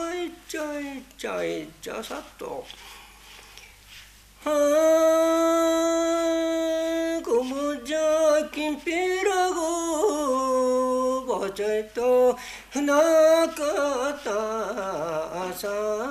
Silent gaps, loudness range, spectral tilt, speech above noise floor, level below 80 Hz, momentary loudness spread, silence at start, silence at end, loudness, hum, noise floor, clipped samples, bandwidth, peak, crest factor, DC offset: none; 11 LU; -3 dB/octave; 25 dB; -56 dBFS; 15 LU; 0 s; 0 s; -24 LUFS; none; -49 dBFS; under 0.1%; 15 kHz; -10 dBFS; 14 dB; under 0.1%